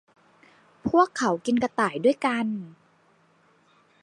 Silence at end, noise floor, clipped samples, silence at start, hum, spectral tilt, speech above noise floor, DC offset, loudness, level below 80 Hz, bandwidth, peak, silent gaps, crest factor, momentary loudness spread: 1.3 s; -62 dBFS; under 0.1%; 0.85 s; none; -5 dB/octave; 38 dB; under 0.1%; -25 LUFS; -62 dBFS; 11 kHz; -6 dBFS; none; 20 dB; 12 LU